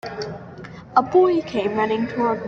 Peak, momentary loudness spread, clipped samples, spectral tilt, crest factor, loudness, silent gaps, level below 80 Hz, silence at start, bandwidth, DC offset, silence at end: -2 dBFS; 19 LU; under 0.1%; -7 dB/octave; 18 dB; -20 LUFS; none; -56 dBFS; 0.05 s; 7 kHz; under 0.1%; 0 s